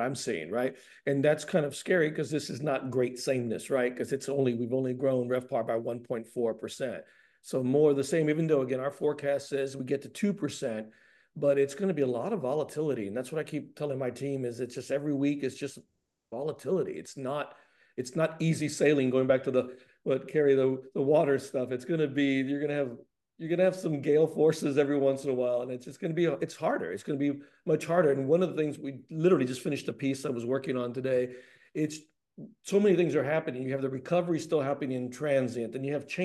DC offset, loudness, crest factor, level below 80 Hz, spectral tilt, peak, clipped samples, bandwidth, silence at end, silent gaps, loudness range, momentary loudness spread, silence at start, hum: under 0.1%; -30 LUFS; 18 dB; -78 dBFS; -6.5 dB/octave; -12 dBFS; under 0.1%; 12.5 kHz; 0 s; none; 5 LU; 11 LU; 0 s; none